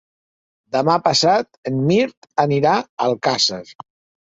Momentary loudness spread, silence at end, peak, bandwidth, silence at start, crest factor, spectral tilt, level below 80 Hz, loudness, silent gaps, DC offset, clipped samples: 7 LU; 0.5 s; -2 dBFS; 8.2 kHz; 0.75 s; 18 dB; -4.5 dB/octave; -60 dBFS; -18 LUFS; 1.57-1.63 s, 2.17-2.22 s, 2.89-2.97 s; under 0.1%; under 0.1%